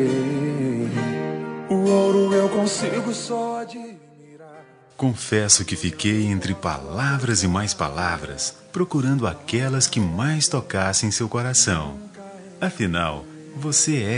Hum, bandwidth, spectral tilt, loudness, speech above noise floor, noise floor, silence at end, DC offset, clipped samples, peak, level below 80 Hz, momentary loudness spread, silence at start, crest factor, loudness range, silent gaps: none; 11 kHz; -4 dB/octave; -22 LUFS; 24 dB; -47 dBFS; 0 s; under 0.1%; under 0.1%; -2 dBFS; -52 dBFS; 11 LU; 0 s; 20 dB; 2 LU; none